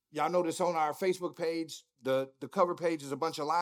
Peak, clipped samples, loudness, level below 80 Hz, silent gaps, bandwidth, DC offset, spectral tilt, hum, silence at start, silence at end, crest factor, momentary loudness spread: -14 dBFS; under 0.1%; -33 LUFS; -88 dBFS; none; 18 kHz; under 0.1%; -5 dB/octave; none; 0.15 s; 0 s; 18 dB; 7 LU